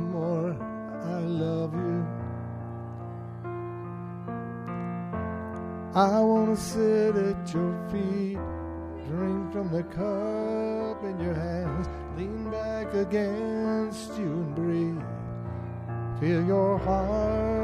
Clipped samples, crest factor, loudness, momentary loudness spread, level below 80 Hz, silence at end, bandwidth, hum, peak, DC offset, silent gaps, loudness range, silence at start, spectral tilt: under 0.1%; 20 dB; -29 LUFS; 12 LU; -46 dBFS; 0 s; 14 kHz; none; -8 dBFS; under 0.1%; none; 8 LU; 0 s; -7.5 dB/octave